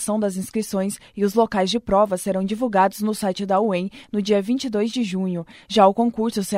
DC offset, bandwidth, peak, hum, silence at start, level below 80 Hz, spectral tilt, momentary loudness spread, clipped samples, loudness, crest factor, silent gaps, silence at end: under 0.1%; 16 kHz; -2 dBFS; none; 0 s; -52 dBFS; -5.5 dB/octave; 9 LU; under 0.1%; -21 LUFS; 18 dB; none; 0 s